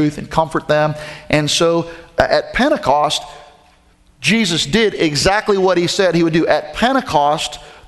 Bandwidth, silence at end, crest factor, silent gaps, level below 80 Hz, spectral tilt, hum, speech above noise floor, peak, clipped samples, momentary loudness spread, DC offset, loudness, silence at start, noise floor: 12.5 kHz; 0.15 s; 16 dB; none; -40 dBFS; -4 dB/octave; none; 36 dB; 0 dBFS; under 0.1%; 6 LU; under 0.1%; -15 LUFS; 0 s; -51 dBFS